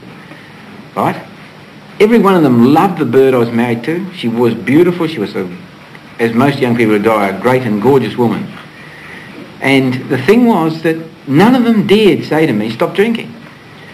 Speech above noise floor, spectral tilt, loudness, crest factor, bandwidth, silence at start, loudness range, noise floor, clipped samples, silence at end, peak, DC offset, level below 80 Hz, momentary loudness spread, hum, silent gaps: 24 dB; -7 dB/octave; -12 LUFS; 12 dB; 14.5 kHz; 0 s; 3 LU; -35 dBFS; under 0.1%; 0 s; 0 dBFS; under 0.1%; -52 dBFS; 19 LU; none; none